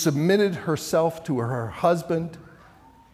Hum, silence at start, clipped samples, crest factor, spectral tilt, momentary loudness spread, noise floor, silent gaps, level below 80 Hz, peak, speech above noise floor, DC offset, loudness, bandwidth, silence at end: none; 0 s; under 0.1%; 16 dB; -6 dB/octave; 8 LU; -52 dBFS; none; -60 dBFS; -8 dBFS; 29 dB; under 0.1%; -24 LUFS; 16 kHz; 0.7 s